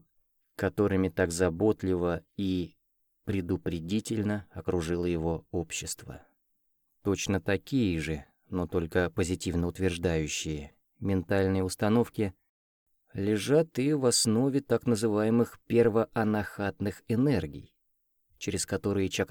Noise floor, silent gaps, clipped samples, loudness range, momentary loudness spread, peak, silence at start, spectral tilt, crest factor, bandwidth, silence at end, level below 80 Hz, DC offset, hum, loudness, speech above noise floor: -75 dBFS; 12.49-12.86 s; under 0.1%; 6 LU; 10 LU; -12 dBFS; 0.6 s; -5.5 dB/octave; 18 dB; over 20 kHz; 0.05 s; -52 dBFS; under 0.1%; none; -29 LUFS; 47 dB